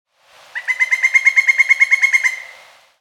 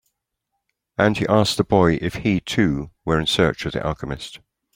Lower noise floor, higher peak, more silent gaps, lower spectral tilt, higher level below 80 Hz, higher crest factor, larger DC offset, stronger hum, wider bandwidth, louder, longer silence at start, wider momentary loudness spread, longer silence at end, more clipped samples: second, -48 dBFS vs -78 dBFS; about the same, 0 dBFS vs -2 dBFS; neither; second, 4.5 dB/octave vs -5.5 dB/octave; second, -82 dBFS vs -42 dBFS; about the same, 16 dB vs 20 dB; neither; neither; about the same, 15 kHz vs 16.5 kHz; first, -12 LUFS vs -20 LUFS; second, 0.55 s vs 1 s; first, 15 LU vs 12 LU; about the same, 0.5 s vs 0.4 s; neither